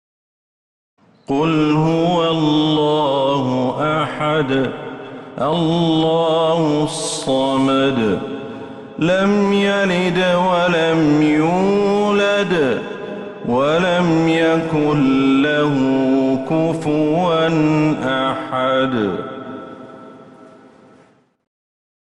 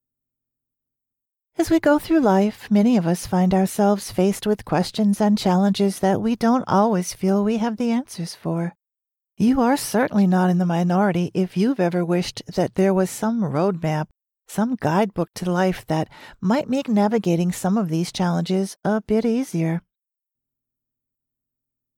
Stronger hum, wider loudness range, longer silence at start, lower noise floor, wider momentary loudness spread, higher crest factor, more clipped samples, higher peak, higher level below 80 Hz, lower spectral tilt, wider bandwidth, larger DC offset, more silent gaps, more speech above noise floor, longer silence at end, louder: neither; about the same, 3 LU vs 4 LU; second, 1.3 s vs 1.6 s; second, -52 dBFS vs -87 dBFS; first, 12 LU vs 8 LU; about the same, 12 dB vs 16 dB; neither; about the same, -6 dBFS vs -6 dBFS; about the same, -52 dBFS vs -52 dBFS; about the same, -6 dB/octave vs -6.5 dB/octave; second, 11.5 kHz vs 16.5 kHz; neither; neither; second, 36 dB vs 67 dB; second, 1.7 s vs 2.2 s; first, -16 LUFS vs -21 LUFS